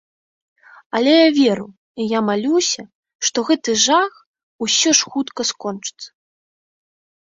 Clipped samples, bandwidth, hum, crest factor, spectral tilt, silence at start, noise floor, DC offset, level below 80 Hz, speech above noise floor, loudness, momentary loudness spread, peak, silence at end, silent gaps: under 0.1%; 7.8 kHz; none; 18 dB; -2 dB/octave; 0.95 s; under -90 dBFS; under 0.1%; -66 dBFS; over 73 dB; -17 LUFS; 14 LU; 0 dBFS; 1.2 s; 1.77-1.95 s, 2.95-3.03 s, 3.15-3.19 s, 4.26-4.34 s, 4.43-4.59 s